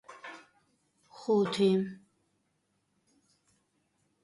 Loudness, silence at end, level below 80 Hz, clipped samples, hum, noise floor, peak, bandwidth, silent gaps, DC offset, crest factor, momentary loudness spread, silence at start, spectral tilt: -29 LUFS; 2.3 s; -78 dBFS; under 0.1%; none; -77 dBFS; -16 dBFS; 11.5 kHz; none; under 0.1%; 20 dB; 21 LU; 0.1 s; -6.5 dB/octave